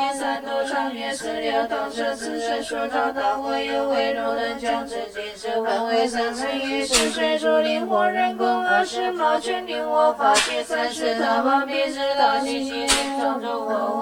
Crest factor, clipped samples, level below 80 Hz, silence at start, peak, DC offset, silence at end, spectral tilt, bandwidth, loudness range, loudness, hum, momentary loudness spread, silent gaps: 20 dB; under 0.1%; -52 dBFS; 0 s; -2 dBFS; under 0.1%; 0 s; -1.5 dB/octave; 19 kHz; 4 LU; -22 LUFS; none; 7 LU; none